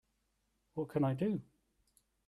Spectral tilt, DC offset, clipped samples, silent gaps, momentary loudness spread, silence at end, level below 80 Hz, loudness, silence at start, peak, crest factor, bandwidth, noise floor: -9.5 dB/octave; under 0.1%; under 0.1%; none; 10 LU; 0.85 s; -72 dBFS; -37 LUFS; 0.75 s; -22 dBFS; 18 dB; 13.5 kHz; -80 dBFS